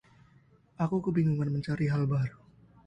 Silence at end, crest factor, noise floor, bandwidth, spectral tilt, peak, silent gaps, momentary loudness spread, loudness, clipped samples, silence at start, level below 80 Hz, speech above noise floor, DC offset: 0.5 s; 16 dB; -62 dBFS; 8 kHz; -9.5 dB/octave; -16 dBFS; none; 5 LU; -30 LUFS; under 0.1%; 0.8 s; -60 dBFS; 33 dB; under 0.1%